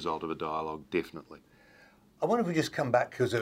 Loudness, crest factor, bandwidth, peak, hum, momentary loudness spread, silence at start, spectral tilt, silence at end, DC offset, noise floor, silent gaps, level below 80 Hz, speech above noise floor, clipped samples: -31 LUFS; 20 dB; 16 kHz; -12 dBFS; none; 8 LU; 0 s; -6 dB/octave; 0 s; under 0.1%; -60 dBFS; none; -66 dBFS; 29 dB; under 0.1%